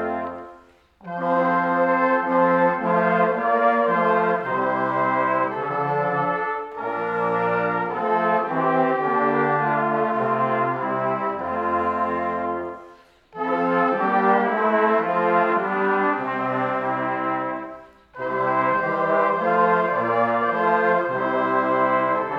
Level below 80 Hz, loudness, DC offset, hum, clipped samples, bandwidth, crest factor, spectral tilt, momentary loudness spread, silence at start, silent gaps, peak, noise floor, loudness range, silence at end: -62 dBFS; -21 LUFS; under 0.1%; none; under 0.1%; 6.4 kHz; 16 dB; -8 dB/octave; 8 LU; 0 s; none; -6 dBFS; -51 dBFS; 4 LU; 0 s